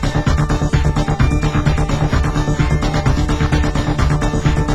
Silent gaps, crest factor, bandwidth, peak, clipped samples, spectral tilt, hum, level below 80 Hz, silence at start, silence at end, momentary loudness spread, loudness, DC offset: none; 14 dB; 12 kHz; -2 dBFS; under 0.1%; -6.5 dB/octave; none; -20 dBFS; 0 s; 0 s; 1 LU; -17 LUFS; under 0.1%